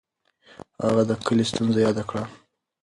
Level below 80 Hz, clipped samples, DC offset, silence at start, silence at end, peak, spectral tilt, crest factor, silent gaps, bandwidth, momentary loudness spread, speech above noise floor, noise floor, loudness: -56 dBFS; under 0.1%; under 0.1%; 0.8 s; 0.45 s; -6 dBFS; -6 dB/octave; 18 dB; none; 11.5 kHz; 10 LU; 35 dB; -57 dBFS; -23 LUFS